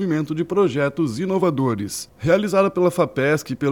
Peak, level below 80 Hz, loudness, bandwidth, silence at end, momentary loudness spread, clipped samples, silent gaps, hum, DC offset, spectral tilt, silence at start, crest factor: -4 dBFS; -54 dBFS; -20 LUFS; 18.5 kHz; 0 s; 6 LU; under 0.1%; none; none; under 0.1%; -6 dB/octave; 0 s; 16 dB